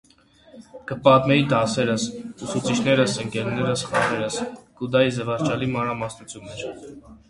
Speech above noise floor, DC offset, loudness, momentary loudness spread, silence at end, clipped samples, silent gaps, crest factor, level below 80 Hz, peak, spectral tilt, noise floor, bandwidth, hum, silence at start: 31 dB; under 0.1%; -22 LUFS; 17 LU; 0.15 s; under 0.1%; none; 22 dB; -54 dBFS; 0 dBFS; -5 dB/octave; -54 dBFS; 11.5 kHz; none; 0.55 s